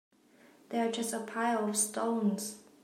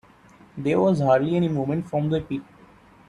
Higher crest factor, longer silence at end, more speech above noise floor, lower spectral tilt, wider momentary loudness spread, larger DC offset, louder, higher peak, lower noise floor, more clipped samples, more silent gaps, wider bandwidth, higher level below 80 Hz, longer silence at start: about the same, 16 dB vs 16 dB; second, 0.2 s vs 0.65 s; about the same, 29 dB vs 30 dB; second, -3.5 dB/octave vs -8.5 dB/octave; second, 8 LU vs 13 LU; neither; second, -33 LUFS vs -23 LUFS; second, -18 dBFS vs -8 dBFS; first, -62 dBFS vs -52 dBFS; neither; neither; first, 16 kHz vs 10.5 kHz; second, -84 dBFS vs -56 dBFS; first, 0.7 s vs 0.55 s